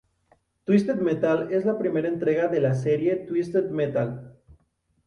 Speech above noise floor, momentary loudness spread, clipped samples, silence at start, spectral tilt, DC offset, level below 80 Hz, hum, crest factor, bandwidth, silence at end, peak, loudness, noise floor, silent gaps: 46 dB; 5 LU; under 0.1%; 0.7 s; -8.5 dB/octave; under 0.1%; -62 dBFS; none; 18 dB; 10.5 kHz; 0.75 s; -8 dBFS; -24 LUFS; -69 dBFS; none